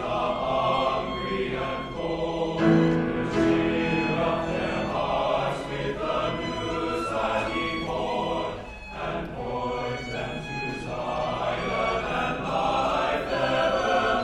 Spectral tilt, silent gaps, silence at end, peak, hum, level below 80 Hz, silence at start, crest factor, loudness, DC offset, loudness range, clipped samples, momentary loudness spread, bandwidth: -6 dB/octave; none; 0 s; -8 dBFS; none; -44 dBFS; 0 s; 18 dB; -26 LUFS; under 0.1%; 6 LU; under 0.1%; 8 LU; 11.5 kHz